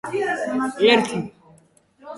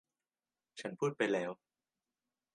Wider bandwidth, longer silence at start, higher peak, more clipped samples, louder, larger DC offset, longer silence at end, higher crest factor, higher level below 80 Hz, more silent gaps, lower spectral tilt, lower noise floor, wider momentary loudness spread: first, 11.5 kHz vs 10 kHz; second, 0.05 s vs 0.75 s; first, -2 dBFS vs -18 dBFS; neither; first, -20 LUFS vs -37 LUFS; neither; second, 0 s vs 1 s; about the same, 20 dB vs 24 dB; first, -64 dBFS vs -88 dBFS; neither; about the same, -4.5 dB/octave vs -5.5 dB/octave; second, -55 dBFS vs under -90 dBFS; second, 13 LU vs 19 LU